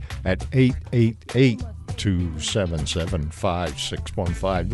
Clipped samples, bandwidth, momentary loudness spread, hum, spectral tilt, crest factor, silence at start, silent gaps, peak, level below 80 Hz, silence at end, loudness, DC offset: under 0.1%; 11.5 kHz; 7 LU; none; -6 dB/octave; 18 dB; 0 s; none; -6 dBFS; -34 dBFS; 0 s; -24 LUFS; under 0.1%